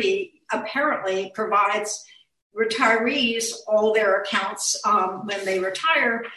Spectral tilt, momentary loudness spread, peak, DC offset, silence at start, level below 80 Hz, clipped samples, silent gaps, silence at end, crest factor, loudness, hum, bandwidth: -1.5 dB/octave; 9 LU; -4 dBFS; under 0.1%; 0 s; -68 dBFS; under 0.1%; 2.42-2.50 s; 0 s; 18 dB; -22 LUFS; none; 12.5 kHz